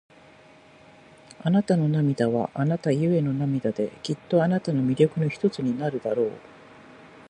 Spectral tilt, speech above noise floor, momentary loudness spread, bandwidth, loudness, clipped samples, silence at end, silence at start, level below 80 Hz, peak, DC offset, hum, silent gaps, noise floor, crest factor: -8 dB/octave; 28 dB; 7 LU; 9.8 kHz; -25 LUFS; under 0.1%; 0.2 s; 1.4 s; -64 dBFS; -6 dBFS; under 0.1%; none; none; -52 dBFS; 20 dB